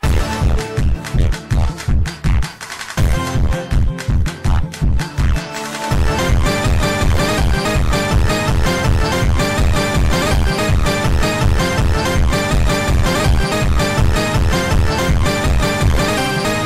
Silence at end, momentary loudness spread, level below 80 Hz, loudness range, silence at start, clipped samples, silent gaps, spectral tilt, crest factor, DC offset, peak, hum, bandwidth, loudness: 0 s; 4 LU; -18 dBFS; 3 LU; 0.05 s; under 0.1%; none; -5 dB/octave; 12 dB; under 0.1%; -2 dBFS; none; 16 kHz; -17 LUFS